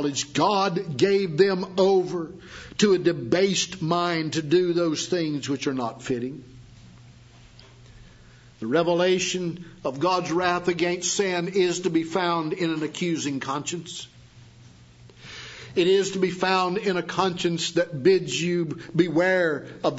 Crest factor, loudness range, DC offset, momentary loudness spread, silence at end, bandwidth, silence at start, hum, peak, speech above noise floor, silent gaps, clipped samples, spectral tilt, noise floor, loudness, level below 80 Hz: 18 dB; 7 LU; under 0.1%; 12 LU; 0 s; 8 kHz; 0 s; none; -6 dBFS; 27 dB; none; under 0.1%; -4.5 dB/octave; -50 dBFS; -24 LUFS; -60 dBFS